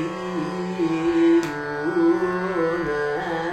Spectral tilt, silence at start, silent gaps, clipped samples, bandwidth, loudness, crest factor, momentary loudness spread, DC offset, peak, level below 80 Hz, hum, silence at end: -6.5 dB/octave; 0 s; none; under 0.1%; 8.8 kHz; -22 LUFS; 12 dB; 9 LU; under 0.1%; -10 dBFS; -52 dBFS; none; 0 s